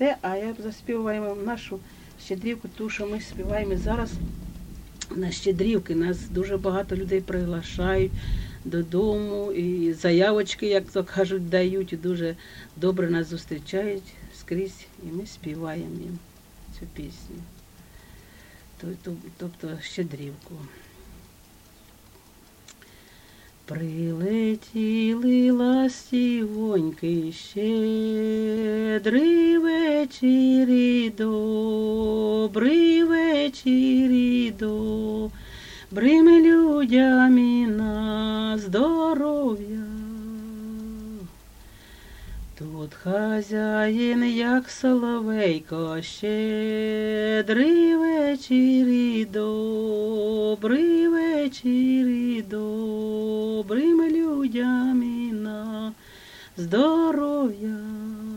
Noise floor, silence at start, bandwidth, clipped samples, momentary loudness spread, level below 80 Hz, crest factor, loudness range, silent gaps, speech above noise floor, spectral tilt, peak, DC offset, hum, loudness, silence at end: -52 dBFS; 0 s; 16.5 kHz; under 0.1%; 17 LU; -44 dBFS; 18 dB; 17 LU; none; 29 dB; -6.5 dB/octave; -6 dBFS; under 0.1%; none; -23 LUFS; 0 s